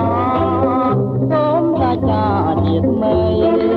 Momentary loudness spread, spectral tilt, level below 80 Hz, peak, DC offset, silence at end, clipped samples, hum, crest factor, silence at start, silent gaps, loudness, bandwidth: 2 LU; -10.5 dB/octave; -36 dBFS; -4 dBFS; under 0.1%; 0 s; under 0.1%; none; 10 dB; 0 s; none; -16 LUFS; 5 kHz